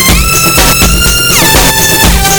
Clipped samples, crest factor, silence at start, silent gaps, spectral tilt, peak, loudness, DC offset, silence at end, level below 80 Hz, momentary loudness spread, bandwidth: 2%; 6 dB; 0 s; none; -2.5 dB/octave; 0 dBFS; -4 LUFS; under 0.1%; 0 s; -14 dBFS; 1 LU; over 20 kHz